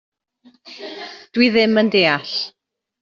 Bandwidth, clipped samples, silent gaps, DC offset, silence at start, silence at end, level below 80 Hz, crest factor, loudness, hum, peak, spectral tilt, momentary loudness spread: 7.2 kHz; under 0.1%; none; under 0.1%; 0.65 s; 0.5 s; -62 dBFS; 18 dB; -16 LUFS; none; -2 dBFS; -2.5 dB/octave; 19 LU